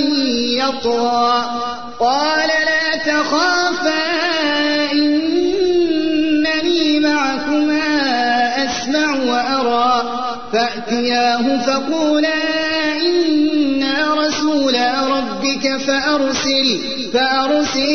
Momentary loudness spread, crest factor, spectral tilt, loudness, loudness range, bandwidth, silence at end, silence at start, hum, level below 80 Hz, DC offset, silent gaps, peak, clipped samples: 3 LU; 12 dB; -2.5 dB/octave; -16 LUFS; 1 LU; 6.6 kHz; 0 s; 0 s; none; -50 dBFS; 2%; none; -4 dBFS; under 0.1%